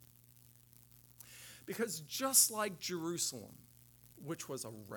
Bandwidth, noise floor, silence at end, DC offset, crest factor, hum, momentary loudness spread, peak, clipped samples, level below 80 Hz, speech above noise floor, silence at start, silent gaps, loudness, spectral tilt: 19 kHz; -63 dBFS; 0 s; under 0.1%; 26 dB; 60 Hz at -65 dBFS; 25 LU; -14 dBFS; under 0.1%; -76 dBFS; 26 dB; 1.2 s; none; -35 LUFS; -2 dB/octave